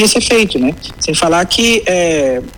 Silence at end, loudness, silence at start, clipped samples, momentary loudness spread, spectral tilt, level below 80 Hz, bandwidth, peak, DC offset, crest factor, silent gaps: 0 s; -12 LUFS; 0 s; under 0.1%; 6 LU; -3 dB/octave; -36 dBFS; 19 kHz; -4 dBFS; under 0.1%; 8 dB; none